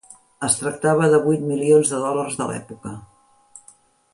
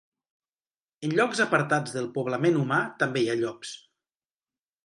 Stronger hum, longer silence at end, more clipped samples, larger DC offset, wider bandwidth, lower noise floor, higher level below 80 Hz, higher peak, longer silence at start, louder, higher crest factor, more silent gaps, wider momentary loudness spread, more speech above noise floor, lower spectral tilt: neither; second, 0.55 s vs 1.05 s; neither; neither; about the same, 11.5 kHz vs 11.5 kHz; second, -53 dBFS vs under -90 dBFS; first, -60 dBFS vs -74 dBFS; first, -4 dBFS vs -8 dBFS; second, 0.1 s vs 1 s; first, -19 LUFS vs -26 LUFS; about the same, 18 dB vs 20 dB; neither; first, 19 LU vs 12 LU; second, 34 dB vs over 64 dB; about the same, -5 dB/octave vs -5.5 dB/octave